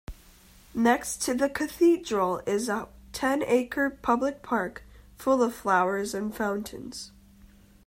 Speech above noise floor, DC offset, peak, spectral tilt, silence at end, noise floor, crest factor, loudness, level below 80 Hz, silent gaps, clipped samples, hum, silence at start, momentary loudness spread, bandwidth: 28 dB; under 0.1%; -8 dBFS; -4 dB/octave; 0.8 s; -54 dBFS; 18 dB; -27 LUFS; -54 dBFS; none; under 0.1%; none; 0.1 s; 14 LU; 16 kHz